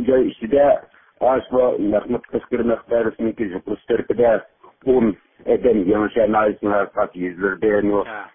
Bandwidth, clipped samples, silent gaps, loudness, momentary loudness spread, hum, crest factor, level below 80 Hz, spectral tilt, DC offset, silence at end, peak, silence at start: 3.7 kHz; under 0.1%; none; -19 LUFS; 7 LU; none; 14 dB; -48 dBFS; -11.5 dB/octave; under 0.1%; 0.1 s; -4 dBFS; 0 s